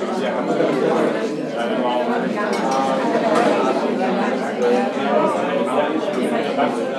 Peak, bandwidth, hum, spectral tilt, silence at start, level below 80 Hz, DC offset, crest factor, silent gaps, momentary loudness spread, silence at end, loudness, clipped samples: -4 dBFS; 13 kHz; none; -5.5 dB/octave; 0 s; -86 dBFS; under 0.1%; 16 dB; none; 4 LU; 0 s; -19 LUFS; under 0.1%